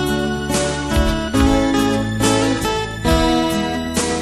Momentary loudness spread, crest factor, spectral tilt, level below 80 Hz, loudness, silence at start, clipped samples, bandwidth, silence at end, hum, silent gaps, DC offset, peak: 5 LU; 16 dB; -4.5 dB/octave; -26 dBFS; -18 LUFS; 0 s; under 0.1%; 14.5 kHz; 0 s; none; none; 0.3%; -2 dBFS